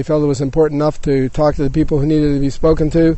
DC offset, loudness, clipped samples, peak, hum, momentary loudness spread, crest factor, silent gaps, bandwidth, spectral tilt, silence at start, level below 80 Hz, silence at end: under 0.1%; -15 LUFS; under 0.1%; -2 dBFS; none; 3 LU; 12 dB; none; 8.4 kHz; -8 dB/octave; 0 s; -26 dBFS; 0 s